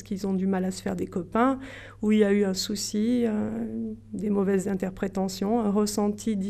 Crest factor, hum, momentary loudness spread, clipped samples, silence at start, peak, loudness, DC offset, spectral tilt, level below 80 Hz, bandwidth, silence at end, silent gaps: 16 dB; none; 9 LU; under 0.1%; 0 s; -10 dBFS; -27 LUFS; under 0.1%; -5.5 dB/octave; -54 dBFS; 14 kHz; 0 s; none